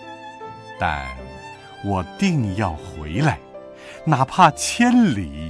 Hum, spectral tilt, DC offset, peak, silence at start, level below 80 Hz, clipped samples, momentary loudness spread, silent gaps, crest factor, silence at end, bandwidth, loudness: none; -5.5 dB/octave; under 0.1%; -2 dBFS; 0 s; -42 dBFS; under 0.1%; 22 LU; none; 20 dB; 0 s; 11 kHz; -20 LUFS